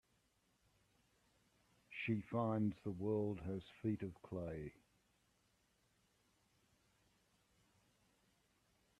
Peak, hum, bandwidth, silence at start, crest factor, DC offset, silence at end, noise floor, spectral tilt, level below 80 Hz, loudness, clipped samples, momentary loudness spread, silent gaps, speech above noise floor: -26 dBFS; 60 Hz at -70 dBFS; 12 kHz; 1.9 s; 20 dB; under 0.1%; 4.3 s; -80 dBFS; -8.5 dB/octave; -74 dBFS; -43 LUFS; under 0.1%; 9 LU; none; 37 dB